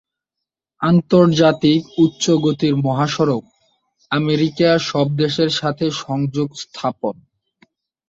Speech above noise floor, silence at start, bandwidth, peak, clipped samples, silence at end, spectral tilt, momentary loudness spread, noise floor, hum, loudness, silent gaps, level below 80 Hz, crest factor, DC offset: 66 dB; 0.8 s; 7.8 kHz; -2 dBFS; under 0.1%; 0.95 s; -6 dB/octave; 10 LU; -83 dBFS; none; -17 LUFS; none; -56 dBFS; 16 dB; under 0.1%